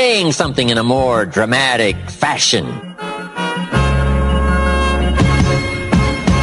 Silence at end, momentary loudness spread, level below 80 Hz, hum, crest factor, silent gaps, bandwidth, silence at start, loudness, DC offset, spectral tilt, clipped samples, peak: 0 s; 8 LU; -22 dBFS; none; 14 dB; none; 11.5 kHz; 0 s; -15 LUFS; under 0.1%; -4.5 dB/octave; under 0.1%; 0 dBFS